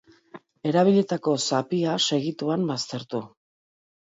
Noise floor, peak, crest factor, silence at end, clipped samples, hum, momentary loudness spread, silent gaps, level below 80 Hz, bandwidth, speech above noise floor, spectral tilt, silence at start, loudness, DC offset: -49 dBFS; -8 dBFS; 18 dB; 0.8 s; under 0.1%; none; 12 LU; none; -72 dBFS; 8 kHz; 25 dB; -5 dB/octave; 0.35 s; -24 LUFS; under 0.1%